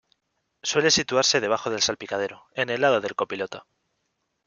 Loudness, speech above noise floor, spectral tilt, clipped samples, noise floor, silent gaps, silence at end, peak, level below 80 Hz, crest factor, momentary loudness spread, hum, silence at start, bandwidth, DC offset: -23 LUFS; 52 dB; -2 dB/octave; under 0.1%; -76 dBFS; none; 0.85 s; -6 dBFS; -64 dBFS; 20 dB; 12 LU; none; 0.65 s; 10 kHz; under 0.1%